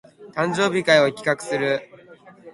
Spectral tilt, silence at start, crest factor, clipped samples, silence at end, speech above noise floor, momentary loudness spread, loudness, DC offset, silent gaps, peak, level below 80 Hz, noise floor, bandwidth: -4.5 dB/octave; 0.2 s; 20 dB; under 0.1%; 0.05 s; 27 dB; 10 LU; -21 LUFS; under 0.1%; none; -2 dBFS; -64 dBFS; -47 dBFS; 11.5 kHz